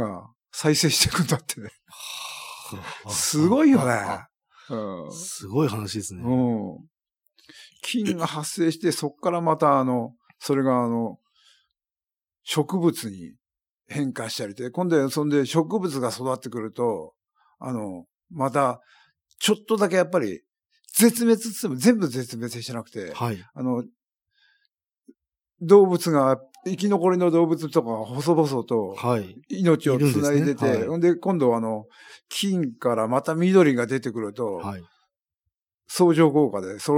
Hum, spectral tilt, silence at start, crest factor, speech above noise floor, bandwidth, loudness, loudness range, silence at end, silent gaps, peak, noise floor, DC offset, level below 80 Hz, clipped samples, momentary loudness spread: none; -5 dB/octave; 0 s; 20 dB; over 67 dB; 18 kHz; -23 LUFS; 6 LU; 0 s; none; -4 dBFS; under -90 dBFS; under 0.1%; -64 dBFS; under 0.1%; 16 LU